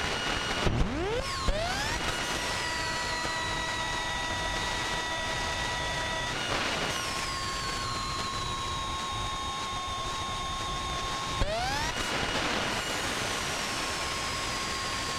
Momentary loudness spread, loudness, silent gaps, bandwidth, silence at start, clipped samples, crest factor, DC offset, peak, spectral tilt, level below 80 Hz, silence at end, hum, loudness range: 3 LU; -30 LUFS; none; 16 kHz; 0 s; under 0.1%; 18 dB; under 0.1%; -14 dBFS; -2.5 dB/octave; -42 dBFS; 0 s; none; 2 LU